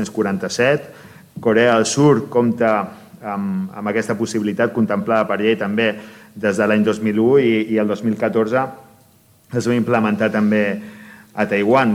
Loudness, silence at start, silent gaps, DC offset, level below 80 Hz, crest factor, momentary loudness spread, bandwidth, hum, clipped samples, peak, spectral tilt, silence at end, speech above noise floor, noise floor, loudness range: -18 LUFS; 0 s; none; under 0.1%; -62 dBFS; 16 dB; 12 LU; 14.5 kHz; none; under 0.1%; -2 dBFS; -5.5 dB/octave; 0 s; 35 dB; -52 dBFS; 2 LU